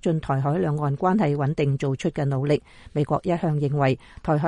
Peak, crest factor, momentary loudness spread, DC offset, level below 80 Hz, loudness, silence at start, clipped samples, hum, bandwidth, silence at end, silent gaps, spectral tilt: -8 dBFS; 14 dB; 4 LU; under 0.1%; -50 dBFS; -24 LUFS; 0.05 s; under 0.1%; none; 9.6 kHz; 0 s; none; -8 dB/octave